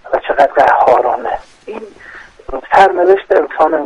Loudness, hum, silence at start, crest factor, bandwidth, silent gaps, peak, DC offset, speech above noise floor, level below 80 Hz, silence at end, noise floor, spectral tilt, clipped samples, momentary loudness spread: -11 LUFS; none; 0.05 s; 12 dB; 11 kHz; none; 0 dBFS; under 0.1%; 25 dB; -42 dBFS; 0 s; -36 dBFS; -5 dB/octave; 0.2%; 20 LU